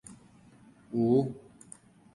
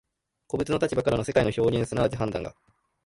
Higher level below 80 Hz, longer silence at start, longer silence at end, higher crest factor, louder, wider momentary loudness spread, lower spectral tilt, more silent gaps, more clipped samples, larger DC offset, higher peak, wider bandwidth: second, -66 dBFS vs -48 dBFS; second, 0.1 s vs 0.55 s; first, 0.75 s vs 0.55 s; about the same, 18 dB vs 18 dB; second, -29 LUFS vs -26 LUFS; first, 25 LU vs 10 LU; first, -8.5 dB/octave vs -6.5 dB/octave; neither; neither; neither; second, -14 dBFS vs -8 dBFS; about the same, 11.5 kHz vs 11.5 kHz